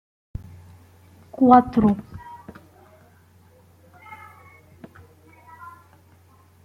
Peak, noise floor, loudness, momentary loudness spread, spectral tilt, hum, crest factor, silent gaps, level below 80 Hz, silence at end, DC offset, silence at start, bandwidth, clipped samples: -2 dBFS; -54 dBFS; -18 LUFS; 29 LU; -9 dB/octave; none; 24 dB; none; -52 dBFS; 4.45 s; under 0.1%; 1.4 s; 5.8 kHz; under 0.1%